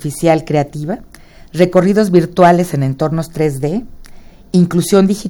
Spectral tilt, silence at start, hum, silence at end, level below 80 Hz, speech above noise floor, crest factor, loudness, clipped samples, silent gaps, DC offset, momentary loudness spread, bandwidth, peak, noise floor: -7 dB/octave; 0 s; none; 0 s; -40 dBFS; 23 dB; 14 dB; -14 LUFS; 0.1%; none; under 0.1%; 13 LU; 17.5 kHz; 0 dBFS; -35 dBFS